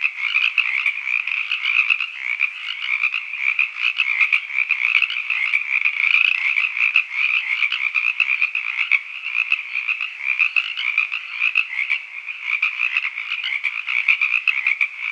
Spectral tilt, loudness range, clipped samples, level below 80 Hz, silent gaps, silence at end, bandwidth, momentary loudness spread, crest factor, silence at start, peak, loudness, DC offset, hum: 4.5 dB/octave; 3 LU; under 0.1%; under -90 dBFS; none; 0 s; 9.8 kHz; 6 LU; 20 dB; 0 s; 0 dBFS; -18 LUFS; under 0.1%; none